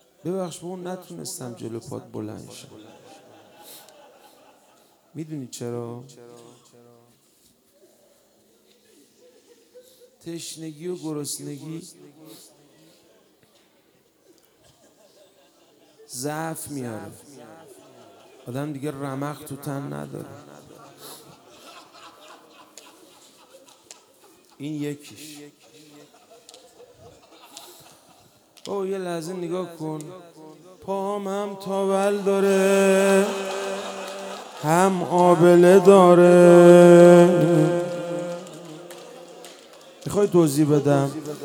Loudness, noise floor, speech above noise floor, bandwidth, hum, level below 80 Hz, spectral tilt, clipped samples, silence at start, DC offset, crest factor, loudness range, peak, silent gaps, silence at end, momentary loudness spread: -19 LUFS; -61 dBFS; 41 dB; 17 kHz; none; -70 dBFS; -6.5 dB/octave; under 0.1%; 0.25 s; under 0.1%; 22 dB; 25 LU; 0 dBFS; none; 0 s; 28 LU